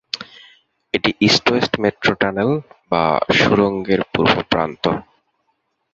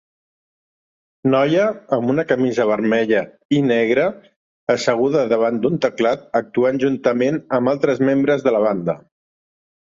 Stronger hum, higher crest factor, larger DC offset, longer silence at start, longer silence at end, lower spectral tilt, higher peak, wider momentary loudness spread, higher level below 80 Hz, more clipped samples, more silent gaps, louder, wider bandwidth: neither; about the same, 18 dB vs 16 dB; neither; second, 0.15 s vs 1.25 s; about the same, 0.9 s vs 1 s; second, -5 dB/octave vs -6.5 dB/octave; about the same, -2 dBFS vs -2 dBFS; first, 10 LU vs 5 LU; first, -48 dBFS vs -62 dBFS; neither; second, none vs 3.45-3.49 s, 4.36-4.67 s; about the same, -17 LUFS vs -18 LUFS; about the same, 8 kHz vs 7.6 kHz